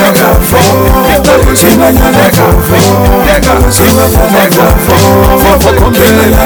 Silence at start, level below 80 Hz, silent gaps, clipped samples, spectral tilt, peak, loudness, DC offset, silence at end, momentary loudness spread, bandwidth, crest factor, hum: 0 s; -12 dBFS; none; 6%; -5 dB/octave; 0 dBFS; -5 LUFS; under 0.1%; 0 s; 2 LU; over 20 kHz; 4 dB; none